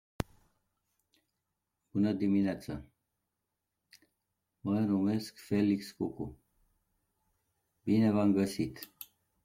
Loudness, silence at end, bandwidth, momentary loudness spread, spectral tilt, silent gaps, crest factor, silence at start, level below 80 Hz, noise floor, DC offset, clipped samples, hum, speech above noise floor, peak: -32 LUFS; 0.4 s; 16 kHz; 16 LU; -7.5 dB/octave; none; 20 dB; 0.2 s; -62 dBFS; -86 dBFS; under 0.1%; under 0.1%; none; 56 dB; -14 dBFS